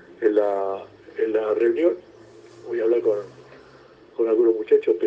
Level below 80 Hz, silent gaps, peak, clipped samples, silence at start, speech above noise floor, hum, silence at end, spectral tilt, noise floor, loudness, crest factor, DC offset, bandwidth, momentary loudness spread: -70 dBFS; none; -6 dBFS; under 0.1%; 0.2 s; 28 dB; none; 0 s; -7 dB/octave; -49 dBFS; -22 LUFS; 16 dB; under 0.1%; 5.8 kHz; 15 LU